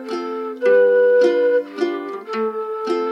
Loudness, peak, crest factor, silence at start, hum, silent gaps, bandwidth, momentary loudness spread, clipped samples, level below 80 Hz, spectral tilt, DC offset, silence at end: -18 LUFS; -6 dBFS; 12 dB; 0 s; none; none; 6.8 kHz; 12 LU; under 0.1%; under -90 dBFS; -5 dB/octave; under 0.1%; 0 s